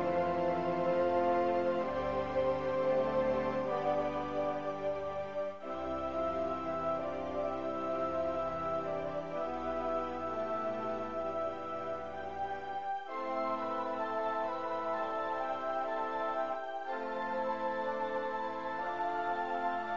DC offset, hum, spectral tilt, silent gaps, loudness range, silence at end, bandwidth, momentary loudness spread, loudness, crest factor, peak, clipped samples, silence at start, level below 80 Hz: 0.3%; none; -4.5 dB/octave; none; 5 LU; 0 s; 7.4 kHz; 7 LU; -35 LUFS; 16 dB; -20 dBFS; under 0.1%; 0 s; -60 dBFS